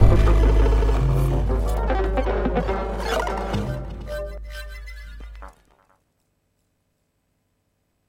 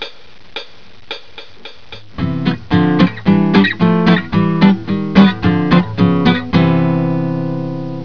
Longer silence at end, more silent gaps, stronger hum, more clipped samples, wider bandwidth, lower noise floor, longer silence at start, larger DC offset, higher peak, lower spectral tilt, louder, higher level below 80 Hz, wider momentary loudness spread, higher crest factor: first, 2.6 s vs 0 s; neither; first, 50 Hz at -55 dBFS vs none; neither; first, 11 kHz vs 5.4 kHz; first, -71 dBFS vs -40 dBFS; about the same, 0 s vs 0 s; second, under 0.1% vs 2%; about the same, 0 dBFS vs 0 dBFS; second, -7 dB/octave vs -8.5 dB/octave; second, -23 LUFS vs -13 LUFS; first, -24 dBFS vs -40 dBFS; first, 21 LU vs 18 LU; first, 22 dB vs 14 dB